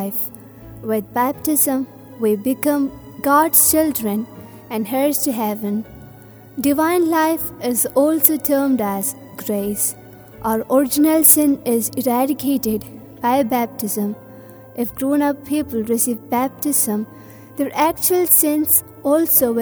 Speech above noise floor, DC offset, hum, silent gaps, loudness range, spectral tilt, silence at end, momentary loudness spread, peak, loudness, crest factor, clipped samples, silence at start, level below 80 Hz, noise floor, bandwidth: 23 dB; under 0.1%; none; none; 5 LU; -3.5 dB/octave; 0 s; 13 LU; 0 dBFS; -17 LUFS; 18 dB; under 0.1%; 0 s; -54 dBFS; -41 dBFS; over 20 kHz